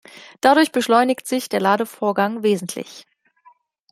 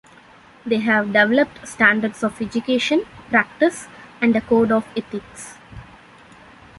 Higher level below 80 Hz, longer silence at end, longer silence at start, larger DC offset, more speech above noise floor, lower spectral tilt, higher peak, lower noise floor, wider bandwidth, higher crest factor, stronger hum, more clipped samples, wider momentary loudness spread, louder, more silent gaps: second, -68 dBFS vs -54 dBFS; about the same, 0.9 s vs 0.95 s; second, 0.15 s vs 0.65 s; neither; first, 36 dB vs 28 dB; about the same, -4 dB/octave vs -4.5 dB/octave; about the same, -2 dBFS vs -2 dBFS; first, -55 dBFS vs -47 dBFS; first, 16 kHz vs 11.5 kHz; about the same, 20 dB vs 20 dB; neither; neither; second, 10 LU vs 20 LU; about the same, -19 LUFS vs -19 LUFS; neither